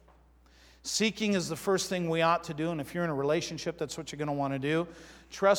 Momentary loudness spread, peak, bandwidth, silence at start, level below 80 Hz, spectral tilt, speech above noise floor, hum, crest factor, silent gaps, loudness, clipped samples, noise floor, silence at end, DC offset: 9 LU; -10 dBFS; 19 kHz; 0.85 s; -62 dBFS; -4.5 dB/octave; 30 dB; none; 20 dB; none; -31 LUFS; under 0.1%; -60 dBFS; 0 s; under 0.1%